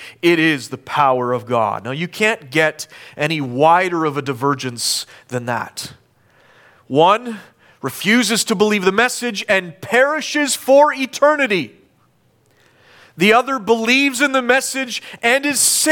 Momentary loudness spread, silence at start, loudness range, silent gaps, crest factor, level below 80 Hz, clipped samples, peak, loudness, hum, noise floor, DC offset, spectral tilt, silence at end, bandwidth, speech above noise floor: 11 LU; 0 s; 5 LU; none; 16 dB; -64 dBFS; under 0.1%; -2 dBFS; -16 LUFS; none; -58 dBFS; under 0.1%; -3 dB/octave; 0 s; 19 kHz; 41 dB